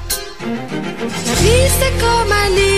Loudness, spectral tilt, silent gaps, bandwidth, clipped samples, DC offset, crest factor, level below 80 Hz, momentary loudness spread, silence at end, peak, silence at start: -15 LUFS; -4 dB/octave; none; 15.5 kHz; under 0.1%; 2%; 12 dB; -24 dBFS; 11 LU; 0 s; -2 dBFS; 0 s